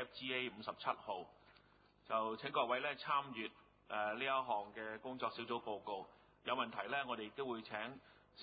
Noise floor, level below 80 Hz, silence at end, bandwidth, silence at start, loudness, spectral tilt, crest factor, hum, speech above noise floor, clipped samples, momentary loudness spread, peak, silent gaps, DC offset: -70 dBFS; -80 dBFS; 0 s; 4.8 kHz; 0 s; -42 LUFS; -1 dB/octave; 22 dB; none; 27 dB; under 0.1%; 10 LU; -22 dBFS; none; under 0.1%